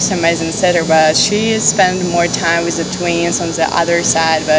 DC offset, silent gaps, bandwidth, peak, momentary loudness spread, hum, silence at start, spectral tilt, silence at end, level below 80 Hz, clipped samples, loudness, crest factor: under 0.1%; none; 8 kHz; 0 dBFS; 4 LU; none; 0 s; -3 dB/octave; 0 s; -42 dBFS; under 0.1%; -13 LUFS; 14 dB